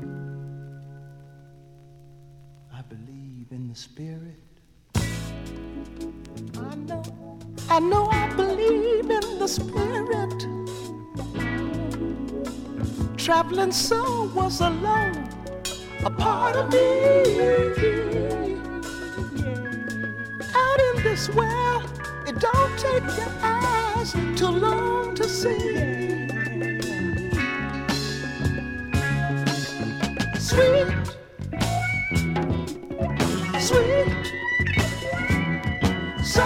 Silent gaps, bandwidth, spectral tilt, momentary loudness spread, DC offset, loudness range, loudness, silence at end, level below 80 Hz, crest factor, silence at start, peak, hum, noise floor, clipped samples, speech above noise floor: none; 17 kHz; -5 dB/octave; 17 LU; under 0.1%; 13 LU; -24 LUFS; 0 s; -40 dBFS; 20 dB; 0 s; -4 dBFS; none; -52 dBFS; under 0.1%; 30 dB